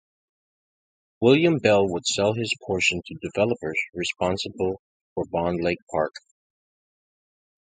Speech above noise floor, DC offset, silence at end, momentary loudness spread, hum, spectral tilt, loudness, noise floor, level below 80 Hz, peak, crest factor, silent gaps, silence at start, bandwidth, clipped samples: over 67 dB; under 0.1%; 1.5 s; 11 LU; none; -4.5 dB/octave; -24 LUFS; under -90 dBFS; -52 dBFS; -4 dBFS; 22 dB; 4.79-5.16 s, 5.82-5.87 s; 1.2 s; 9.6 kHz; under 0.1%